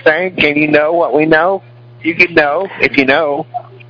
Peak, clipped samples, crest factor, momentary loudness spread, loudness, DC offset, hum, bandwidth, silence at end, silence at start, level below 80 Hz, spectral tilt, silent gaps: 0 dBFS; 0.3%; 12 dB; 11 LU; -12 LUFS; under 0.1%; none; 5.4 kHz; 0.15 s; 0.05 s; -48 dBFS; -6.5 dB/octave; none